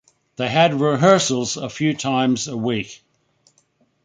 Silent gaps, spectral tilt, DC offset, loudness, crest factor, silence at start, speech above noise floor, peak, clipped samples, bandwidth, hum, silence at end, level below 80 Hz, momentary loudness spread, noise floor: none; -4.5 dB/octave; under 0.1%; -19 LUFS; 18 dB; 0.4 s; 44 dB; -2 dBFS; under 0.1%; 9.6 kHz; none; 1.1 s; -60 dBFS; 11 LU; -63 dBFS